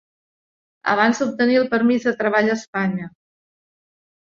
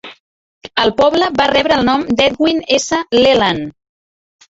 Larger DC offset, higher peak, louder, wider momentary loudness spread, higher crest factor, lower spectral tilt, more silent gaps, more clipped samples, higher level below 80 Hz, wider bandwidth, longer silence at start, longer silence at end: neither; second, -4 dBFS vs 0 dBFS; second, -19 LUFS vs -13 LUFS; first, 9 LU vs 5 LU; about the same, 18 dB vs 14 dB; first, -5.5 dB/octave vs -3.5 dB/octave; second, 2.68-2.73 s vs 0.20-0.61 s; neither; second, -66 dBFS vs -44 dBFS; about the same, 7.4 kHz vs 8 kHz; first, 0.85 s vs 0.05 s; first, 1.25 s vs 0.8 s